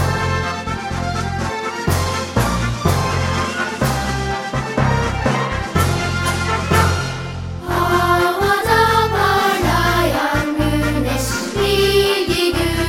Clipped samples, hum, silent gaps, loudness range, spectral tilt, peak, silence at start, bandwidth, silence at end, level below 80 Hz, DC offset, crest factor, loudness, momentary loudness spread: under 0.1%; none; none; 4 LU; -5 dB/octave; -2 dBFS; 0 s; 16.5 kHz; 0 s; -30 dBFS; under 0.1%; 16 dB; -18 LUFS; 8 LU